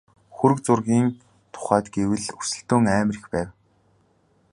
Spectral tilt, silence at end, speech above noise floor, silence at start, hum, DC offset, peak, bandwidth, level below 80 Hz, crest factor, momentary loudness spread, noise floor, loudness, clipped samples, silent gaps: -6 dB/octave; 1 s; 41 dB; 0.35 s; none; under 0.1%; -2 dBFS; 11.5 kHz; -52 dBFS; 20 dB; 10 LU; -63 dBFS; -23 LUFS; under 0.1%; none